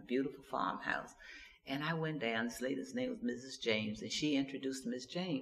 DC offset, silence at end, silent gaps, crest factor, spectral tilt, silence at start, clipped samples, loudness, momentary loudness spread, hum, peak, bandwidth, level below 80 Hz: under 0.1%; 0 s; none; 20 dB; -4.5 dB/octave; 0 s; under 0.1%; -39 LUFS; 6 LU; none; -18 dBFS; 14.5 kHz; -70 dBFS